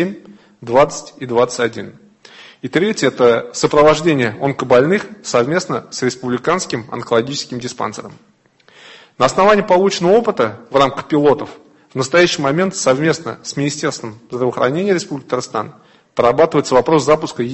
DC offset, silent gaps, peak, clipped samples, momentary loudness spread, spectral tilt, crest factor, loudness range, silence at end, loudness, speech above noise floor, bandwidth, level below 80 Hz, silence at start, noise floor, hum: under 0.1%; none; 0 dBFS; under 0.1%; 12 LU; -4.5 dB/octave; 16 dB; 5 LU; 0 s; -16 LUFS; 35 dB; 8.6 kHz; -52 dBFS; 0 s; -50 dBFS; none